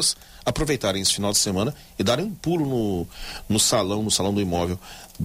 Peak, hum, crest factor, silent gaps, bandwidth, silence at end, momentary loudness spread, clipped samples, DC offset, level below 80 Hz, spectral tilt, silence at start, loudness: -8 dBFS; none; 16 dB; none; 16 kHz; 0 s; 10 LU; under 0.1%; under 0.1%; -44 dBFS; -3.5 dB/octave; 0 s; -23 LUFS